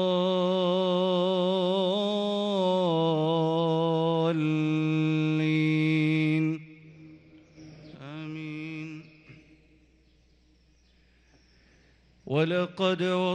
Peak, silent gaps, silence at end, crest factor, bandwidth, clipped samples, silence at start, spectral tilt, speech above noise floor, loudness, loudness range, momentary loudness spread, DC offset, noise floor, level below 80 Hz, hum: -14 dBFS; none; 0 s; 14 dB; 8.6 kHz; under 0.1%; 0 s; -7.5 dB/octave; 36 dB; -26 LUFS; 17 LU; 13 LU; under 0.1%; -62 dBFS; -68 dBFS; none